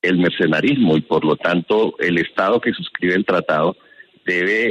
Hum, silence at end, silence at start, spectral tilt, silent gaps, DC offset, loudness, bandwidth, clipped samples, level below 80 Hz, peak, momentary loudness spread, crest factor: none; 0 s; 0.05 s; -7 dB/octave; none; under 0.1%; -18 LUFS; 9 kHz; under 0.1%; -56 dBFS; -4 dBFS; 5 LU; 14 dB